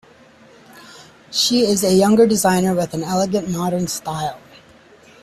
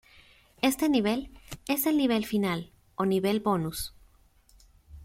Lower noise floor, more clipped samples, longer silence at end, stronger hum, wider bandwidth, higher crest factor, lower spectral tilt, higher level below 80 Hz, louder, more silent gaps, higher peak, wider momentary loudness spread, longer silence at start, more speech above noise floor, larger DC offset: second, -47 dBFS vs -61 dBFS; neither; first, 0.85 s vs 0 s; neither; second, 14.5 kHz vs 16.5 kHz; about the same, 16 dB vs 20 dB; about the same, -4.5 dB/octave vs -5 dB/octave; about the same, -54 dBFS vs -54 dBFS; first, -17 LUFS vs -28 LUFS; neither; first, -4 dBFS vs -10 dBFS; second, 10 LU vs 13 LU; about the same, 0.75 s vs 0.65 s; about the same, 31 dB vs 34 dB; neither